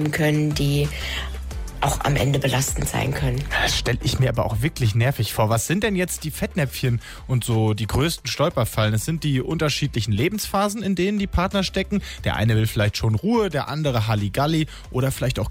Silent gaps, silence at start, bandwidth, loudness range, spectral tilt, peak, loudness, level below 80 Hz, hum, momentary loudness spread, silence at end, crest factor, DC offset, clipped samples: none; 0 s; 16.5 kHz; 1 LU; -5 dB/octave; -10 dBFS; -22 LUFS; -34 dBFS; none; 5 LU; 0 s; 12 dB; under 0.1%; under 0.1%